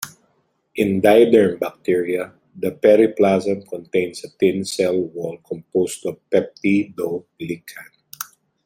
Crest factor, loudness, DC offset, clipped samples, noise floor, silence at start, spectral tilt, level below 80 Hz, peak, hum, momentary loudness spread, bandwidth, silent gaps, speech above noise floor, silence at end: 18 dB; -19 LUFS; under 0.1%; under 0.1%; -66 dBFS; 0 s; -5.5 dB/octave; -62 dBFS; 0 dBFS; none; 19 LU; 16.5 kHz; none; 47 dB; 0.4 s